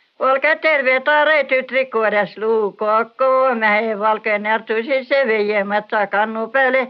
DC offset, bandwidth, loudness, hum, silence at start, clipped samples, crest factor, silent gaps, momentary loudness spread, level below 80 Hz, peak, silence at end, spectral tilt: under 0.1%; 5.6 kHz; -17 LUFS; none; 0.2 s; under 0.1%; 14 dB; none; 5 LU; -76 dBFS; -4 dBFS; 0 s; -7 dB/octave